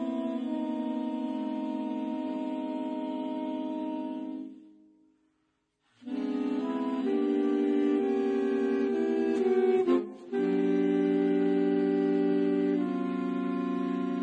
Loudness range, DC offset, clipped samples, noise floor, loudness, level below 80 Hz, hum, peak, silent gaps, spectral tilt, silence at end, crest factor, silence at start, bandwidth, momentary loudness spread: 10 LU; under 0.1%; under 0.1%; -76 dBFS; -29 LUFS; -76 dBFS; none; -14 dBFS; none; -8 dB/octave; 0 s; 14 dB; 0 s; 8.2 kHz; 8 LU